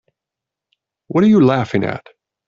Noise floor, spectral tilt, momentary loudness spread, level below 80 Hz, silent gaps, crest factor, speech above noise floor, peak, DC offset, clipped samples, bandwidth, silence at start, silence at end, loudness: -85 dBFS; -8.5 dB/octave; 13 LU; -56 dBFS; none; 16 dB; 71 dB; -2 dBFS; under 0.1%; under 0.1%; 7.2 kHz; 1.1 s; 0.5 s; -15 LUFS